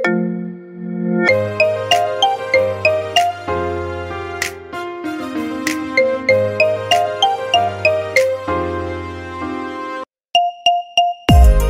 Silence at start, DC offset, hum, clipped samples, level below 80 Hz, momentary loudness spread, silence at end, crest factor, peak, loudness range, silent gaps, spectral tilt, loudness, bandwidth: 0 s; under 0.1%; none; under 0.1%; -24 dBFS; 12 LU; 0 s; 16 dB; 0 dBFS; 4 LU; none; -5 dB/octave; -17 LUFS; 16 kHz